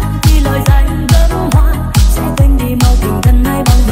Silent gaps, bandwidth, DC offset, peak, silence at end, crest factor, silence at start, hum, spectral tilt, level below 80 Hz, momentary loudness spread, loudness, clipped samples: none; 16.5 kHz; under 0.1%; 0 dBFS; 0 s; 8 dB; 0 s; none; -6 dB/octave; -10 dBFS; 1 LU; -11 LUFS; 0.2%